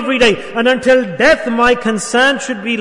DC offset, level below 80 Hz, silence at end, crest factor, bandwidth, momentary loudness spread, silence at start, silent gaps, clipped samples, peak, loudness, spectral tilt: under 0.1%; -42 dBFS; 0 s; 12 dB; 11 kHz; 5 LU; 0 s; none; under 0.1%; -2 dBFS; -13 LUFS; -3.5 dB/octave